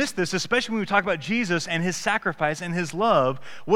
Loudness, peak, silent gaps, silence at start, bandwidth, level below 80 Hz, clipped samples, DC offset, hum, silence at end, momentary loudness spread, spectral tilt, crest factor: -24 LUFS; -4 dBFS; none; 0 s; 16 kHz; -54 dBFS; under 0.1%; 0.6%; none; 0 s; 5 LU; -4.5 dB/octave; 20 dB